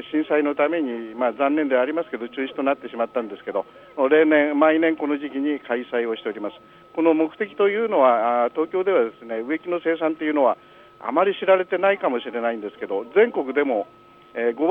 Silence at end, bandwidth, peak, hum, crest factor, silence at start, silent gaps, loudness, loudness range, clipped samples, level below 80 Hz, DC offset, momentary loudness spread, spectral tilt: 0 s; 4 kHz; -4 dBFS; 50 Hz at -65 dBFS; 18 dB; 0 s; none; -22 LUFS; 2 LU; under 0.1%; -72 dBFS; under 0.1%; 11 LU; -7.5 dB/octave